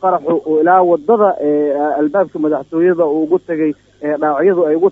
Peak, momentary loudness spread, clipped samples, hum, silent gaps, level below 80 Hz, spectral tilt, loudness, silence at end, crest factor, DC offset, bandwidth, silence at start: 0 dBFS; 7 LU; under 0.1%; none; none; -60 dBFS; -9.5 dB/octave; -14 LUFS; 0 s; 14 dB; under 0.1%; 3.9 kHz; 0 s